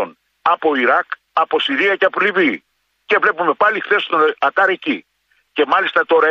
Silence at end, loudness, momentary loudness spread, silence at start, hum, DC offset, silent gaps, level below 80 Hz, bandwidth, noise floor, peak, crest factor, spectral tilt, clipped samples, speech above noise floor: 0 s; -16 LUFS; 7 LU; 0 s; none; under 0.1%; none; -70 dBFS; 7.4 kHz; -61 dBFS; -2 dBFS; 14 dB; -5 dB/octave; under 0.1%; 45 dB